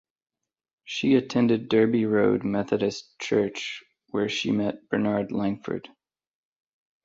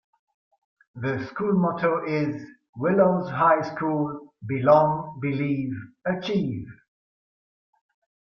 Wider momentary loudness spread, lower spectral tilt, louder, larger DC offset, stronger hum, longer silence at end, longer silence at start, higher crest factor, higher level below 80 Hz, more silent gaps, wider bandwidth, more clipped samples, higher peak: about the same, 12 LU vs 13 LU; second, -6 dB/octave vs -8.5 dB/octave; about the same, -25 LUFS vs -24 LUFS; neither; neither; second, 1.25 s vs 1.55 s; about the same, 0.85 s vs 0.95 s; about the same, 18 dB vs 22 dB; about the same, -62 dBFS vs -62 dBFS; second, none vs 2.69-2.73 s; first, 7.8 kHz vs 6.8 kHz; neither; second, -8 dBFS vs -4 dBFS